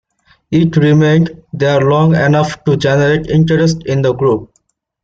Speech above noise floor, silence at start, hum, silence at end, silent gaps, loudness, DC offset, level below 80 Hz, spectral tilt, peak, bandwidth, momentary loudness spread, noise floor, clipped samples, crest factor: 50 dB; 0.5 s; none; 0.6 s; none; -12 LUFS; under 0.1%; -42 dBFS; -7 dB/octave; -2 dBFS; 7.6 kHz; 5 LU; -61 dBFS; under 0.1%; 10 dB